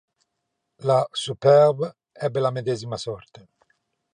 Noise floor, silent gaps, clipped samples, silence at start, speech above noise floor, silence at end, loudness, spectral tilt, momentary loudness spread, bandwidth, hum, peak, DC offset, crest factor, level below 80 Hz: -79 dBFS; none; under 0.1%; 0.8 s; 57 dB; 0.95 s; -22 LUFS; -6 dB/octave; 15 LU; 10 kHz; none; -4 dBFS; under 0.1%; 20 dB; -66 dBFS